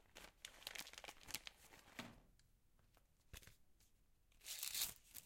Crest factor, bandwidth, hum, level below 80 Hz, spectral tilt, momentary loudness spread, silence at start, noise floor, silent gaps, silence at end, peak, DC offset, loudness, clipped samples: 34 dB; 16.5 kHz; none; -74 dBFS; 0 dB/octave; 18 LU; 0 s; -75 dBFS; none; 0 s; -22 dBFS; under 0.1%; -50 LUFS; under 0.1%